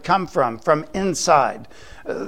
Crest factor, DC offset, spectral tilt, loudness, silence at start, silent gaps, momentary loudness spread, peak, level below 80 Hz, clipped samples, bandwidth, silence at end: 20 dB; 0.8%; -4 dB/octave; -19 LUFS; 0.05 s; none; 16 LU; -2 dBFS; -50 dBFS; under 0.1%; 16 kHz; 0 s